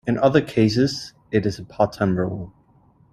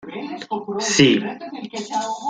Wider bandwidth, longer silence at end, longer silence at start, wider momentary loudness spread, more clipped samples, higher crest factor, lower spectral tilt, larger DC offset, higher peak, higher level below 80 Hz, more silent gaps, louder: first, 13.5 kHz vs 9.6 kHz; first, 0.65 s vs 0 s; about the same, 0.05 s vs 0 s; second, 12 LU vs 16 LU; neither; about the same, 20 dB vs 20 dB; first, -6.5 dB/octave vs -3.5 dB/octave; neither; about the same, -2 dBFS vs 0 dBFS; first, -50 dBFS vs -60 dBFS; neither; about the same, -21 LUFS vs -20 LUFS